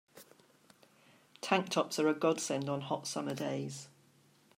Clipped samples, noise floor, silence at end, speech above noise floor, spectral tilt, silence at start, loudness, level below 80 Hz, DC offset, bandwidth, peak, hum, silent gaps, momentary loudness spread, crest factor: under 0.1%; -67 dBFS; 0.7 s; 33 dB; -4.5 dB/octave; 0.15 s; -34 LUFS; -82 dBFS; under 0.1%; 16 kHz; -12 dBFS; none; none; 13 LU; 24 dB